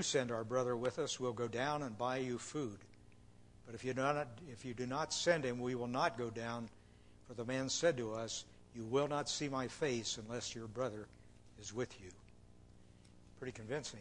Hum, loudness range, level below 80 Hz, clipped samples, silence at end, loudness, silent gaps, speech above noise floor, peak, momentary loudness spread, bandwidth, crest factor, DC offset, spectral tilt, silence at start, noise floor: 60 Hz at -65 dBFS; 6 LU; -68 dBFS; under 0.1%; 0 s; -40 LUFS; none; 22 dB; -18 dBFS; 14 LU; 11 kHz; 22 dB; under 0.1%; -4 dB/octave; 0 s; -62 dBFS